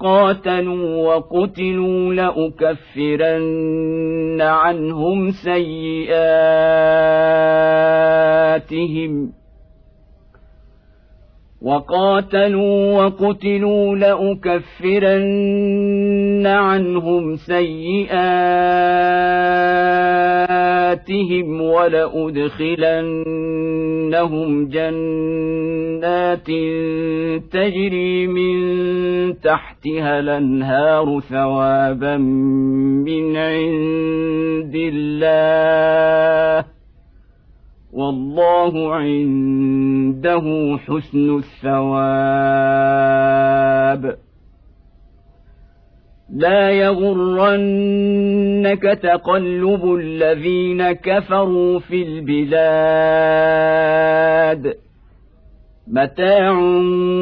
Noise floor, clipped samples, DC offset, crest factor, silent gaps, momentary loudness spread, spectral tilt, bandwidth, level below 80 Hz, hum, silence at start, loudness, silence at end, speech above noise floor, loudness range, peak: -48 dBFS; under 0.1%; under 0.1%; 12 dB; none; 7 LU; -9.5 dB/octave; 5.4 kHz; -46 dBFS; none; 0 s; -16 LUFS; 0 s; 33 dB; 4 LU; -4 dBFS